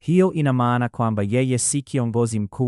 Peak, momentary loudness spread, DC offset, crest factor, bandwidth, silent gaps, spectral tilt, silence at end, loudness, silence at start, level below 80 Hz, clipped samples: -6 dBFS; 4 LU; under 0.1%; 16 dB; 12 kHz; none; -6 dB/octave; 0 s; -21 LUFS; 0.05 s; -58 dBFS; under 0.1%